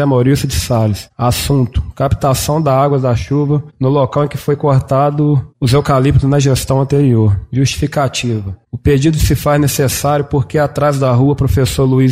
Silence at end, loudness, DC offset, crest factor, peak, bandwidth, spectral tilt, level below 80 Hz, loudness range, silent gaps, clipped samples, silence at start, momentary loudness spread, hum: 0 s; -13 LUFS; under 0.1%; 10 dB; -2 dBFS; 16 kHz; -6.5 dB/octave; -28 dBFS; 2 LU; none; under 0.1%; 0 s; 5 LU; none